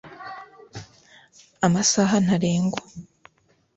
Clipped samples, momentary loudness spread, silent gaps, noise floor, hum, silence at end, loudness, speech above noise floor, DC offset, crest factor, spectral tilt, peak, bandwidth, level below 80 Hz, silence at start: under 0.1%; 23 LU; none; -64 dBFS; none; 0.75 s; -21 LUFS; 43 dB; under 0.1%; 20 dB; -4.5 dB/octave; -4 dBFS; 8.2 kHz; -58 dBFS; 0.05 s